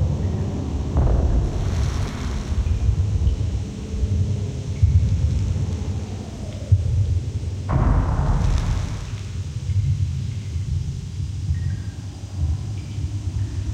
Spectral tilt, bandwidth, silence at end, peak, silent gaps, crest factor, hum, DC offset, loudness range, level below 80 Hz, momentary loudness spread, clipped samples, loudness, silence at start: -7.5 dB/octave; 9.2 kHz; 0 s; -4 dBFS; none; 18 dB; none; under 0.1%; 4 LU; -26 dBFS; 9 LU; under 0.1%; -24 LUFS; 0 s